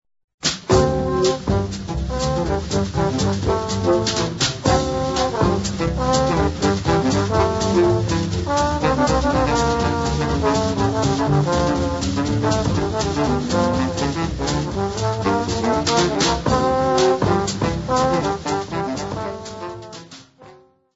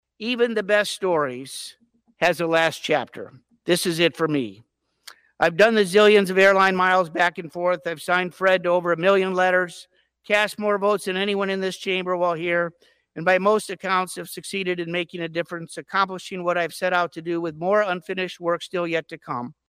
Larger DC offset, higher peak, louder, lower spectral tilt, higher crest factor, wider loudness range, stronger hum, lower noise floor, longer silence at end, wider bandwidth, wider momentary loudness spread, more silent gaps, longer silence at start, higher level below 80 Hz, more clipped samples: first, 0.1% vs under 0.1%; first, -2 dBFS vs -6 dBFS; about the same, -20 LUFS vs -22 LUFS; about the same, -5 dB/octave vs -4.5 dB/octave; about the same, 18 dB vs 16 dB; second, 2 LU vs 6 LU; neither; about the same, -48 dBFS vs -49 dBFS; first, 0.4 s vs 0.15 s; second, 8 kHz vs 15.5 kHz; second, 6 LU vs 13 LU; neither; first, 0.45 s vs 0.2 s; first, -32 dBFS vs -68 dBFS; neither